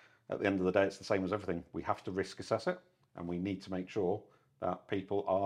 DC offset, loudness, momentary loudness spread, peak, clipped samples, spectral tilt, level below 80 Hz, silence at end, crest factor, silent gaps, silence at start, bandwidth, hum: under 0.1%; -36 LUFS; 10 LU; -14 dBFS; under 0.1%; -6.5 dB/octave; -68 dBFS; 0 s; 22 dB; none; 0.3 s; 11 kHz; none